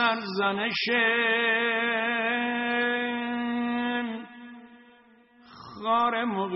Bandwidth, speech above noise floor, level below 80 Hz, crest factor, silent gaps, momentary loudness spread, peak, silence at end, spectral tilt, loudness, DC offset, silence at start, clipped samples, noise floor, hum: 6 kHz; 31 dB; -72 dBFS; 16 dB; none; 12 LU; -10 dBFS; 0 s; -1 dB/octave; -26 LUFS; under 0.1%; 0 s; under 0.1%; -57 dBFS; none